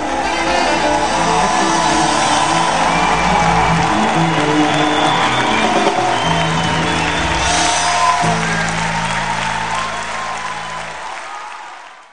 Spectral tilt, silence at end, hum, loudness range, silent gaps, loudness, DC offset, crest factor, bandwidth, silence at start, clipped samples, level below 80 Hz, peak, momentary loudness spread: -3.5 dB/octave; 0 s; none; 5 LU; none; -15 LUFS; 2%; 16 dB; 10 kHz; 0 s; under 0.1%; -34 dBFS; 0 dBFS; 11 LU